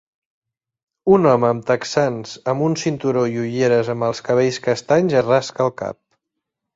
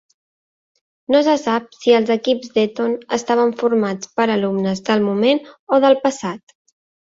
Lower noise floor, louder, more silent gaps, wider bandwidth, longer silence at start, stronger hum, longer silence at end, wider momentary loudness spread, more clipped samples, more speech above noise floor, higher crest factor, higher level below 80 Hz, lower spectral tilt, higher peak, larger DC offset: second, -80 dBFS vs under -90 dBFS; about the same, -18 LUFS vs -18 LUFS; second, none vs 5.59-5.67 s; about the same, 7.8 kHz vs 7.8 kHz; about the same, 1.05 s vs 1.1 s; neither; about the same, 0.85 s vs 0.8 s; about the same, 7 LU vs 7 LU; neither; second, 62 dB vs over 73 dB; about the same, 18 dB vs 16 dB; first, -58 dBFS vs -64 dBFS; about the same, -6 dB/octave vs -5 dB/octave; about the same, -2 dBFS vs -2 dBFS; neither